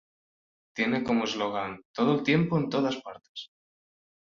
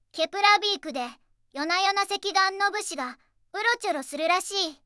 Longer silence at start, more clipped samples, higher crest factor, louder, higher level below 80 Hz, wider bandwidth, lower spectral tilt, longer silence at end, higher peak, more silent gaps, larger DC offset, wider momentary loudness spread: first, 0.75 s vs 0.15 s; neither; about the same, 18 dB vs 22 dB; second, -28 LUFS vs -25 LUFS; first, -66 dBFS vs -72 dBFS; second, 7.4 kHz vs 12 kHz; first, -6 dB/octave vs 0.5 dB/octave; first, 0.8 s vs 0.1 s; second, -12 dBFS vs -6 dBFS; first, 1.85-1.94 s, 3.29-3.35 s vs none; neither; first, 17 LU vs 14 LU